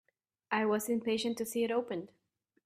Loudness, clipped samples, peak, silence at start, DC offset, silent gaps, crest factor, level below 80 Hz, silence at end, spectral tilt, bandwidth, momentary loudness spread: -34 LUFS; under 0.1%; -16 dBFS; 0.5 s; under 0.1%; none; 18 dB; -78 dBFS; 0.6 s; -4 dB/octave; 15.5 kHz; 10 LU